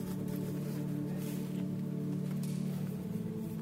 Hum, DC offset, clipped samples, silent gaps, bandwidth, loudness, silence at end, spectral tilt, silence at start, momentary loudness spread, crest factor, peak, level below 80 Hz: none; under 0.1%; under 0.1%; none; 16 kHz; -38 LUFS; 0 s; -7.5 dB/octave; 0 s; 2 LU; 10 dB; -26 dBFS; -64 dBFS